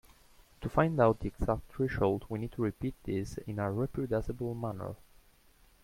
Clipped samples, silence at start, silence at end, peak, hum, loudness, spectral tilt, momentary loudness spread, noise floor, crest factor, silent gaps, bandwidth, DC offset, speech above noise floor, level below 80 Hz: under 0.1%; 0.4 s; 0.9 s; -10 dBFS; none; -33 LUFS; -8 dB/octave; 11 LU; -63 dBFS; 24 dB; none; 16.5 kHz; under 0.1%; 31 dB; -50 dBFS